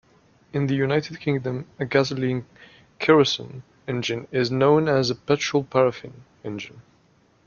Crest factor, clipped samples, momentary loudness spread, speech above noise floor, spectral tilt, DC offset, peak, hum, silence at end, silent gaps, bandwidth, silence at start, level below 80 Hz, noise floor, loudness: 22 dB; under 0.1%; 17 LU; 37 dB; -5.5 dB/octave; under 0.1%; -2 dBFS; none; 0.65 s; none; 7.2 kHz; 0.55 s; -60 dBFS; -60 dBFS; -23 LUFS